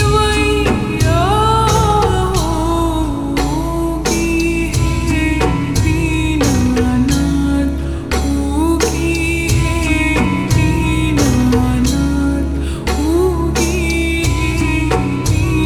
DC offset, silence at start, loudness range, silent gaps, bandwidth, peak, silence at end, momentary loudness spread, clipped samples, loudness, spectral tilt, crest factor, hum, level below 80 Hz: under 0.1%; 0 s; 2 LU; none; 19.5 kHz; 0 dBFS; 0 s; 5 LU; under 0.1%; -15 LUFS; -5.5 dB/octave; 14 dB; none; -22 dBFS